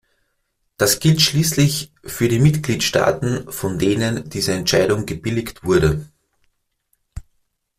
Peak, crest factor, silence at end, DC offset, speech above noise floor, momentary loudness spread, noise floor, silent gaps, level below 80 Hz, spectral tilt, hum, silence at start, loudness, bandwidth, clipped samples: 0 dBFS; 20 dB; 0.6 s; under 0.1%; 52 dB; 9 LU; -70 dBFS; none; -42 dBFS; -4.5 dB/octave; none; 0.8 s; -18 LUFS; 16 kHz; under 0.1%